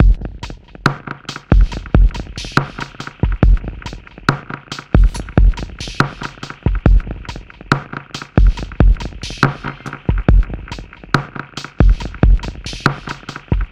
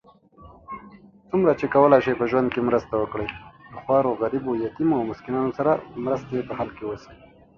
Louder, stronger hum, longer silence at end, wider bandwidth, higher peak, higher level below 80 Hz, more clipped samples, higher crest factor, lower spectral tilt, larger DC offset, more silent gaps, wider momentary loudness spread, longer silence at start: first, -18 LUFS vs -23 LUFS; neither; second, 0.05 s vs 0.45 s; first, 8 kHz vs 6.8 kHz; about the same, 0 dBFS vs -2 dBFS; first, -16 dBFS vs -54 dBFS; neither; second, 16 dB vs 22 dB; second, -6.5 dB/octave vs -8.5 dB/octave; neither; neither; second, 13 LU vs 19 LU; second, 0 s vs 0.4 s